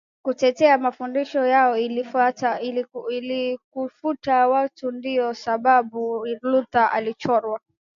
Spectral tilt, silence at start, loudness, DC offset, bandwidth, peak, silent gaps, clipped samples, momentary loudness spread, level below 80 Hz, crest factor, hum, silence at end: -5 dB/octave; 0.25 s; -22 LUFS; under 0.1%; 7.4 kHz; -4 dBFS; 3.64-3.71 s; under 0.1%; 11 LU; -68 dBFS; 18 dB; none; 0.4 s